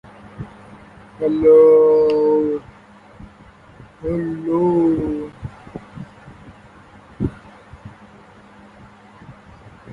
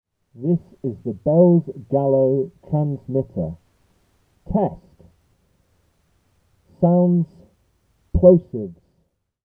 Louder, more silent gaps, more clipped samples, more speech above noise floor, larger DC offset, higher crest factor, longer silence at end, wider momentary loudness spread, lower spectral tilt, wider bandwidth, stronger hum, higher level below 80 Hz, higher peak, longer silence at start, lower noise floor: first, -16 LUFS vs -20 LUFS; neither; neither; second, 31 dB vs 50 dB; neither; about the same, 18 dB vs 22 dB; second, 0 s vs 0.75 s; first, 26 LU vs 15 LU; second, -9.5 dB/octave vs -13.5 dB/octave; first, 5.2 kHz vs 1.9 kHz; neither; second, -46 dBFS vs -40 dBFS; about the same, -2 dBFS vs 0 dBFS; second, 0.25 s vs 0.4 s; second, -45 dBFS vs -68 dBFS